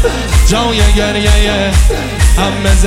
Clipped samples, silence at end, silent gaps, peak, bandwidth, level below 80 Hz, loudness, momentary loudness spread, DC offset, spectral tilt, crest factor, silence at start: under 0.1%; 0 s; none; 0 dBFS; 15.5 kHz; -12 dBFS; -11 LUFS; 2 LU; under 0.1%; -4.5 dB/octave; 8 dB; 0 s